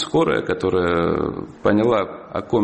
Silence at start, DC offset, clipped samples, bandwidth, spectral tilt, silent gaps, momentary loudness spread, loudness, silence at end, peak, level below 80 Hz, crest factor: 0 s; under 0.1%; under 0.1%; 8.6 kHz; -7 dB/octave; none; 8 LU; -20 LUFS; 0 s; -2 dBFS; -46 dBFS; 16 dB